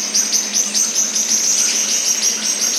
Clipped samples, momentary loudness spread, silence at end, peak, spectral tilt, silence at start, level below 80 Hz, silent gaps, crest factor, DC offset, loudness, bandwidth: under 0.1%; 2 LU; 0 s; -2 dBFS; 1.5 dB/octave; 0 s; under -90 dBFS; none; 16 dB; under 0.1%; -14 LUFS; 16.5 kHz